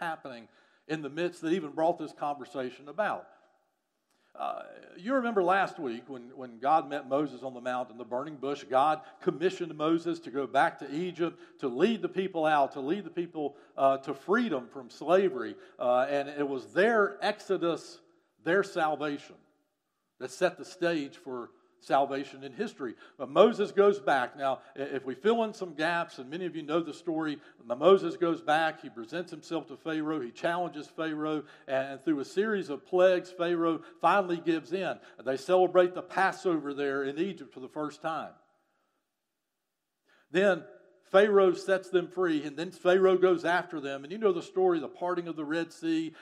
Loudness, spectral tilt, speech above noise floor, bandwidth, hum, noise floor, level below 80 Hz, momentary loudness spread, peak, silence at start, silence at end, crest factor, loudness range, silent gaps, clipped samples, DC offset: -30 LUFS; -5.5 dB/octave; 55 dB; 11.5 kHz; none; -85 dBFS; -88 dBFS; 13 LU; -6 dBFS; 0 s; 0 s; 24 dB; 6 LU; none; under 0.1%; under 0.1%